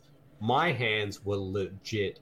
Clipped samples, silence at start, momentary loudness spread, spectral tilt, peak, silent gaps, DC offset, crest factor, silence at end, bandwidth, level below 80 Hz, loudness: under 0.1%; 0.4 s; 8 LU; -5.5 dB/octave; -16 dBFS; none; under 0.1%; 16 dB; 0.1 s; 15.5 kHz; -64 dBFS; -30 LUFS